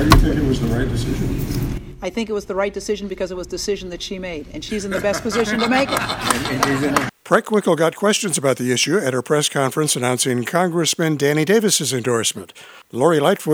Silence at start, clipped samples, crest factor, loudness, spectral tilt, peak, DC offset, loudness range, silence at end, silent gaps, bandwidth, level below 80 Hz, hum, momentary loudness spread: 0 s; under 0.1%; 18 dB; -19 LUFS; -4 dB/octave; 0 dBFS; under 0.1%; 6 LU; 0 s; none; over 20 kHz; -30 dBFS; none; 11 LU